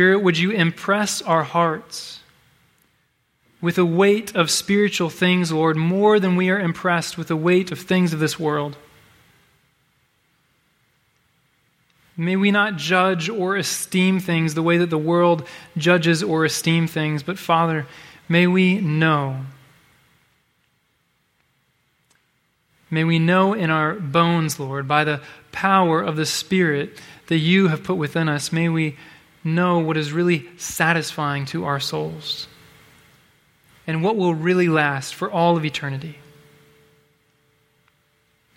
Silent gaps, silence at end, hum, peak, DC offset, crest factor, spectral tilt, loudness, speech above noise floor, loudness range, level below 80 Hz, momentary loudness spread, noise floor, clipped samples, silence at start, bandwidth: none; 2.45 s; none; -2 dBFS; under 0.1%; 20 dB; -5 dB/octave; -20 LUFS; 47 dB; 7 LU; -62 dBFS; 10 LU; -67 dBFS; under 0.1%; 0 s; 16 kHz